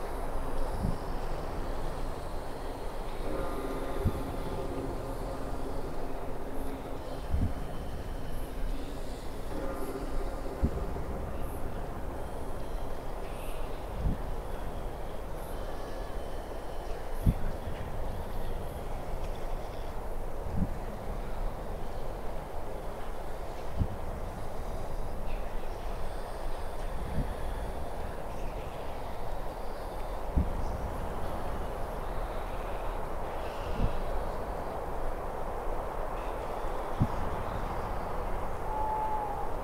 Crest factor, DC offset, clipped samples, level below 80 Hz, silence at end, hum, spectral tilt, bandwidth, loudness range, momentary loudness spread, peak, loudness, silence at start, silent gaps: 22 dB; under 0.1%; under 0.1%; -36 dBFS; 0 s; none; -6.5 dB/octave; 15.5 kHz; 3 LU; 7 LU; -12 dBFS; -38 LUFS; 0 s; none